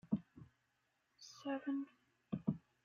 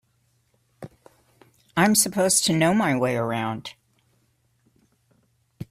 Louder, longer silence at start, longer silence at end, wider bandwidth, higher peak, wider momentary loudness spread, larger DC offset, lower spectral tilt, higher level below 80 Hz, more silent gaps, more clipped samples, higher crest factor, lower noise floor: second, -45 LUFS vs -21 LUFS; second, 0.05 s vs 0.8 s; first, 0.25 s vs 0.1 s; second, 7.2 kHz vs 16 kHz; second, -24 dBFS vs -4 dBFS; second, 20 LU vs 26 LU; neither; first, -7 dB/octave vs -3.5 dB/octave; second, -76 dBFS vs -62 dBFS; neither; neither; about the same, 22 dB vs 22 dB; first, -83 dBFS vs -67 dBFS